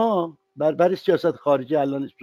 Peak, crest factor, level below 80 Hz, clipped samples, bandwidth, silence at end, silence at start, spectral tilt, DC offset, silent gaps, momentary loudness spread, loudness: -6 dBFS; 16 dB; -70 dBFS; under 0.1%; 13 kHz; 0.15 s; 0 s; -7.5 dB/octave; under 0.1%; none; 6 LU; -22 LUFS